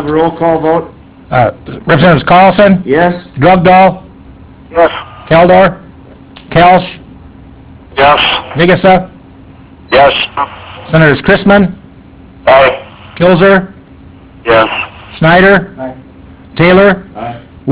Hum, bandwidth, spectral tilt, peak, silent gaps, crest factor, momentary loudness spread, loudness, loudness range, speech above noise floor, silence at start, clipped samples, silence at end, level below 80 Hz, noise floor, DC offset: none; 4 kHz; -10 dB/octave; 0 dBFS; none; 8 dB; 17 LU; -8 LUFS; 3 LU; 28 dB; 0 s; 2%; 0 s; -34 dBFS; -35 dBFS; under 0.1%